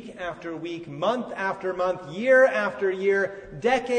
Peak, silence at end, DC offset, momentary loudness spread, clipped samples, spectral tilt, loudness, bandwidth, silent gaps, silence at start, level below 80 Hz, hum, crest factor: -8 dBFS; 0 s; under 0.1%; 16 LU; under 0.1%; -5 dB/octave; -25 LUFS; 9.4 kHz; none; 0 s; -60 dBFS; none; 16 dB